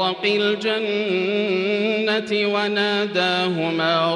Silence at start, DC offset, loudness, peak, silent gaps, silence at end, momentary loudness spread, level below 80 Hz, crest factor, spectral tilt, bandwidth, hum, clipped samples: 0 s; under 0.1%; -20 LUFS; -6 dBFS; none; 0 s; 2 LU; -70 dBFS; 14 dB; -5 dB/octave; 10.5 kHz; none; under 0.1%